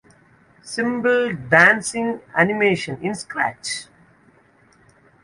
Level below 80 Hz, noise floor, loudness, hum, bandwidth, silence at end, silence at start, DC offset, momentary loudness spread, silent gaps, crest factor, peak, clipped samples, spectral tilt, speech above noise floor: -60 dBFS; -55 dBFS; -19 LUFS; none; 11.5 kHz; 1.4 s; 0.65 s; under 0.1%; 15 LU; none; 22 dB; 0 dBFS; under 0.1%; -4 dB/octave; 36 dB